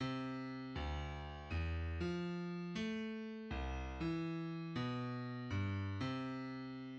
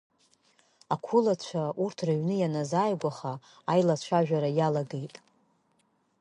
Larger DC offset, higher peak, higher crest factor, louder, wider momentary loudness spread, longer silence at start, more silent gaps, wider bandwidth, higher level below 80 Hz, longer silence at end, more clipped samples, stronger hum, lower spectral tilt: neither; second, -28 dBFS vs -10 dBFS; about the same, 14 dB vs 18 dB; second, -43 LUFS vs -29 LUFS; second, 4 LU vs 12 LU; second, 0 s vs 0.9 s; neither; second, 8.2 kHz vs 10.5 kHz; first, -52 dBFS vs -74 dBFS; second, 0 s vs 1.15 s; neither; neither; about the same, -7 dB/octave vs -7 dB/octave